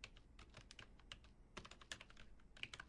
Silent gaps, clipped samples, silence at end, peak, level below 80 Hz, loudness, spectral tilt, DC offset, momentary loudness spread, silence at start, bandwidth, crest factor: none; under 0.1%; 0 s; -30 dBFS; -66 dBFS; -59 LUFS; -2 dB/octave; under 0.1%; 10 LU; 0 s; 11 kHz; 30 dB